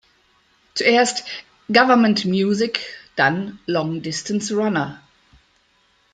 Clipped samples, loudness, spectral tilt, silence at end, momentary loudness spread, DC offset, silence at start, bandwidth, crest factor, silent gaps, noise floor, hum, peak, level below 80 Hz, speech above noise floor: under 0.1%; -19 LUFS; -4.5 dB/octave; 1.15 s; 14 LU; under 0.1%; 0.75 s; 9.4 kHz; 20 dB; none; -61 dBFS; none; -2 dBFS; -62 dBFS; 42 dB